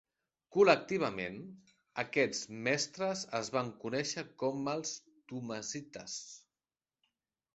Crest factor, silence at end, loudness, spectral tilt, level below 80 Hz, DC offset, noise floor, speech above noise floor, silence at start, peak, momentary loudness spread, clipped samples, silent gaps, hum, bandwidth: 24 dB; 1.15 s; -35 LUFS; -3.5 dB/octave; -74 dBFS; under 0.1%; under -90 dBFS; over 55 dB; 0.5 s; -12 dBFS; 16 LU; under 0.1%; none; none; 8.2 kHz